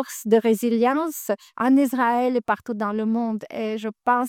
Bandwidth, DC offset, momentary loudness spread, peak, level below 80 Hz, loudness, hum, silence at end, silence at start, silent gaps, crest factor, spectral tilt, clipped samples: 17.5 kHz; under 0.1%; 9 LU; -6 dBFS; -72 dBFS; -22 LUFS; none; 0 s; 0 s; none; 16 dB; -5 dB/octave; under 0.1%